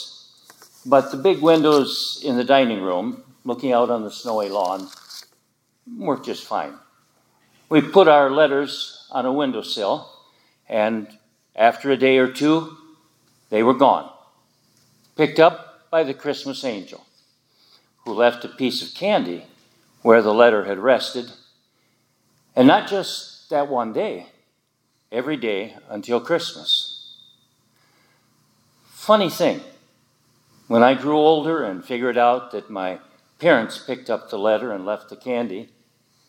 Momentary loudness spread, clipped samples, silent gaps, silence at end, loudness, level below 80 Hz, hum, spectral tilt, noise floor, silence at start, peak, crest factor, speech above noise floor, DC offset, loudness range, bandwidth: 16 LU; under 0.1%; none; 0.65 s; -20 LUFS; -80 dBFS; none; -5 dB/octave; -68 dBFS; 0 s; 0 dBFS; 20 dB; 49 dB; under 0.1%; 6 LU; 17 kHz